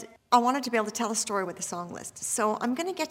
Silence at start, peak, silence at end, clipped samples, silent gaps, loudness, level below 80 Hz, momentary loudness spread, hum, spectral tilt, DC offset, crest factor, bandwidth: 0 s; -8 dBFS; 0 s; under 0.1%; none; -28 LUFS; -74 dBFS; 11 LU; none; -2.5 dB/octave; under 0.1%; 20 dB; 16.5 kHz